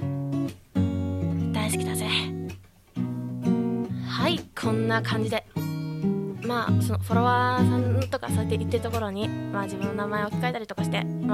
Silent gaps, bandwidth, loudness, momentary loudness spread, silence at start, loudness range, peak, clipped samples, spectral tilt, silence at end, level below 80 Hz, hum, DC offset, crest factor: none; 15.5 kHz; -27 LUFS; 8 LU; 0 s; 3 LU; -10 dBFS; under 0.1%; -6 dB/octave; 0 s; -56 dBFS; none; under 0.1%; 18 dB